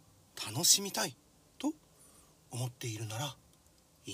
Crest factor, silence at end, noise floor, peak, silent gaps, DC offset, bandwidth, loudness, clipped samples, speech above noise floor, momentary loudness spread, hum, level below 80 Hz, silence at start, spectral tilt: 26 dB; 0 s; -65 dBFS; -10 dBFS; none; under 0.1%; 16 kHz; -33 LUFS; under 0.1%; 32 dB; 22 LU; none; -74 dBFS; 0.35 s; -2 dB/octave